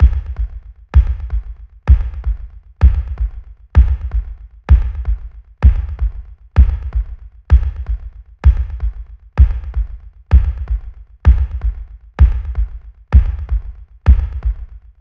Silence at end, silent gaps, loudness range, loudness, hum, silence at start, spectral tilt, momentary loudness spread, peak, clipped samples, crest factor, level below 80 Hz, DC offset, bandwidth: 0.2 s; none; 1 LU; -18 LUFS; none; 0 s; -9.5 dB/octave; 19 LU; 0 dBFS; 0.1%; 14 dB; -16 dBFS; under 0.1%; 3.4 kHz